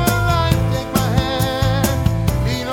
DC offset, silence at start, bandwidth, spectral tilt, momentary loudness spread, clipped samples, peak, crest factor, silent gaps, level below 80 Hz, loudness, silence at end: under 0.1%; 0 s; 17.5 kHz; -5.5 dB/octave; 3 LU; under 0.1%; -2 dBFS; 16 dB; none; -26 dBFS; -18 LUFS; 0 s